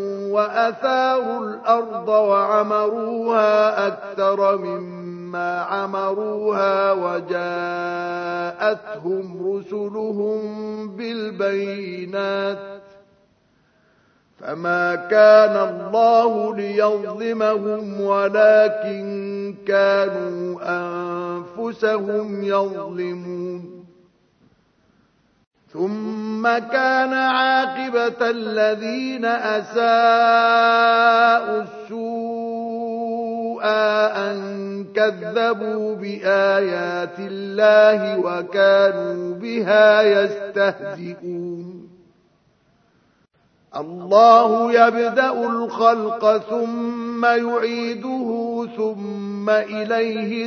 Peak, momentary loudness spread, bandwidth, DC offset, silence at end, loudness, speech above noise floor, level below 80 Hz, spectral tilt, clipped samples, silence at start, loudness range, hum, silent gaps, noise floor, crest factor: 0 dBFS; 14 LU; 6.6 kHz; under 0.1%; 0 s; -19 LUFS; 42 dB; -74 dBFS; -5.5 dB/octave; under 0.1%; 0 s; 10 LU; none; 25.47-25.51 s; -61 dBFS; 20 dB